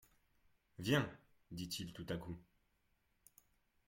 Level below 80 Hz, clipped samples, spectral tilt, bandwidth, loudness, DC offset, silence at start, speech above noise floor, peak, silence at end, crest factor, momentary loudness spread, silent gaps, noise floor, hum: -70 dBFS; under 0.1%; -5 dB/octave; 16.5 kHz; -42 LUFS; under 0.1%; 0.8 s; 38 dB; -20 dBFS; 1.45 s; 24 dB; 17 LU; none; -80 dBFS; none